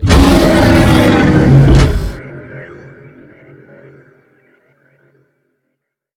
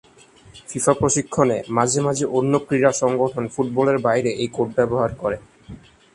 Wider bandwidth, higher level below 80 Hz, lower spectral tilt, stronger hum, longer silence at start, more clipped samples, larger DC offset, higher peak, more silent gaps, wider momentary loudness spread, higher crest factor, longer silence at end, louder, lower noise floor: first, 16.5 kHz vs 11.5 kHz; first, -20 dBFS vs -52 dBFS; first, -6.5 dB/octave vs -5 dB/octave; neither; second, 0 s vs 0.55 s; first, 0.6% vs under 0.1%; neither; about the same, 0 dBFS vs 0 dBFS; neither; first, 23 LU vs 6 LU; second, 12 dB vs 20 dB; first, 3.5 s vs 0.35 s; first, -9 LUFS vs -20 LUFS; first, -72 dBFS vs -49 dBFS